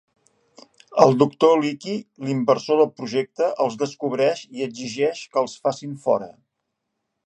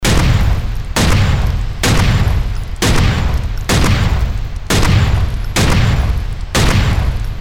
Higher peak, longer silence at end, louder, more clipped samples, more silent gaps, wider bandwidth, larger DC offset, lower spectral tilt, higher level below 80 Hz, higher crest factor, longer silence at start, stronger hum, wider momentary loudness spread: about the same, 0 dBFS vs -2 dBFS; first, 0.95 s vs 0 s; second, -22 LUFS vs -15 LUFS; neither; neither; second, 9.2 kHz vs 17.5 kHz; second, under 0.1% vs 2%; about the same, -6 dB/octave vs -5 dB/octave; second, -70 dBFS vs -16 dBFS; first, 22 dB vs 12 dB; first, 0.9 s vs 0 s; neither; first, 12 LU vs 7 LU